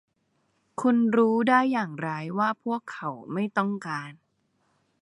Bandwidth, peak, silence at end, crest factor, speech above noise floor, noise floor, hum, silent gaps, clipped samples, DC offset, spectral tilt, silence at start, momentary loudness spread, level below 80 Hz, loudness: 10.5 kHz; -6 dBFS; 0.9 s; 20 dB; 47 dB; -72 dBFS; none; none; under 0.1%; under 0.1%; -7 dB/octave; 0.8 s; 14 LU; -78 dBFS; -26 LUFS